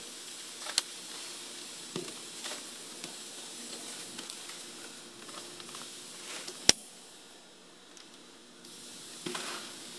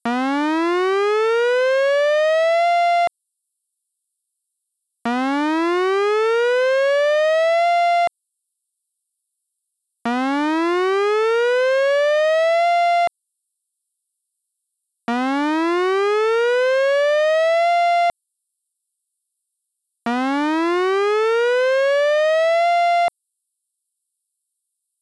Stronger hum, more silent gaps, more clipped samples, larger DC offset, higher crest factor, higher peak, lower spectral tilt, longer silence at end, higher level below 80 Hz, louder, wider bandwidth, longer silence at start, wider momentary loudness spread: neither; neither; neither; neither; first, 40 dB vs 8 dB; first, 0 dBFS vs -10 dBFS; second, -0.5 dB/octave vs -3 dB/octave; second, 0 s vs 1.95 s; about the same, -70 dBFS vs -72 dBFS; second, -36 LUFS vs -18 LUFS; about the same, 12 kHz vs 11 kHz; about the same, 0 s vs 0.05 s; first, 18 LU vs 5 LU